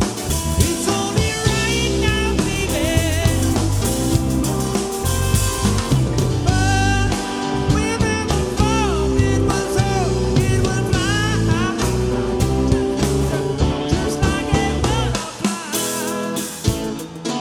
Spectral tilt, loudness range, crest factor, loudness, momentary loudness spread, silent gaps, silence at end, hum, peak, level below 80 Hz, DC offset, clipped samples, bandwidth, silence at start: -5 dB/octave; 2 LU; 16 dB; -19 LUFS; 4 LU; none; 0 s; none; -2 dBFS; -26 dBFS; under 0.1%; under 0.1%; 19 kHz; 0 s